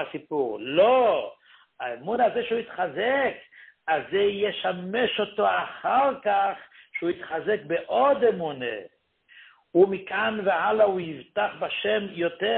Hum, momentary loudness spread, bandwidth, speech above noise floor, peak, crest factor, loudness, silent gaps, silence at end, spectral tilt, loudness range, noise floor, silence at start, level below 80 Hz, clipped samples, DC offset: none; 11 LU; 4.3 kHz; 30 dB; -8 dBFS; 18 dB; -25 LUFS; none; 0 s; -9 dB/octave; 2 LU; -55 dBFS; 0 s; -68 dBFS; under 0.1%; under 0.1%